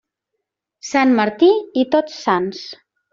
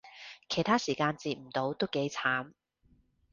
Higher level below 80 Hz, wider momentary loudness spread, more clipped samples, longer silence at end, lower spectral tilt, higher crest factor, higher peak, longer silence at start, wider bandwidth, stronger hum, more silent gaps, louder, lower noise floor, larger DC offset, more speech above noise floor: first, -64 dBFS vs -70 dBFS; first, 18 LU vs 15 LU; neither; second, 0.4 s vs 0.85 s; about the same, -3.5 dB/octave vs -4.5 dB/octave; second, 16 dB vs 22 dB; first, -2 dBFS vs -12 dBFS; first, 0.85 s vs 0.05 s; about the same, 7.6 kHz vs 7.6 kHz; neither; neither; first, -17 LUFS vs -32 LUFS; first, -78 dBFS vs -68 dBFS; neither; first, 62 dB vs 36 dB